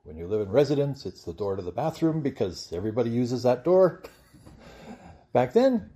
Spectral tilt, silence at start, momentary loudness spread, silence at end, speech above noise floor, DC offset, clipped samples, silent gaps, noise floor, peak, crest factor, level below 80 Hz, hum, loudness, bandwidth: -7.5 dB/octave; 0.05 s; 15 LU; 0.05 s; 25 dB; under 0.1%; under 0.1%; none; -50 dBFS; -8 dBFS; 18 dB; -58 dBFS; none; -26 LUFS; 14 kHz